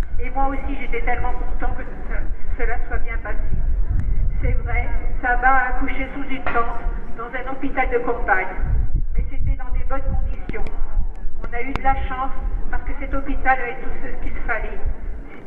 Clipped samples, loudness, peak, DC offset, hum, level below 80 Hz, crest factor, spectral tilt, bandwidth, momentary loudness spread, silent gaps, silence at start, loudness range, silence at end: under 0.1%; -25 LUFS; -2 dBFS; under 0.1%; none; -22 dBFS; 14 dB; -9 dB/octave; 3.3 kHz; 11 LU; none; 0 s; 5 LU; 0 s